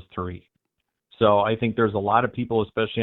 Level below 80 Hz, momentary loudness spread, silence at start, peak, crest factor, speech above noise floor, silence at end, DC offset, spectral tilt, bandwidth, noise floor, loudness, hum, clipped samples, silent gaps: -56 dBFS; 13 LU; 0.15 s; -4 dBFS; 20 dB; 57 dB; 0 s; under 0.1%; -10.5 dB/octave; 4.1 kHz; -80 dBFS; -23 LUFS; none; under 0.1%; none